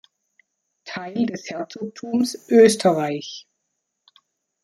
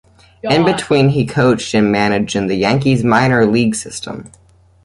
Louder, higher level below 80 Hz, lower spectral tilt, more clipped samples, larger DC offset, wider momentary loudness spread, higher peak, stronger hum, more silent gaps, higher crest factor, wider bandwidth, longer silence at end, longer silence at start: second, -20 LUFS vs -14 LUFS; second, -68 dBFS vs -44 dBFS; about the same, -4.5 dB/octave vs -5.5 dB/octave; neither; neither; first, 19 LU vs 13 LU; about the same, -2 dBFS vs 0 dBFS; neither; neither; first, 20 dB vs 14 dB; first, 13.5 kHz vs 11.5 kHz; first, 1.25 s vs 0.55 s; first, 0.85 s vs 0.45 s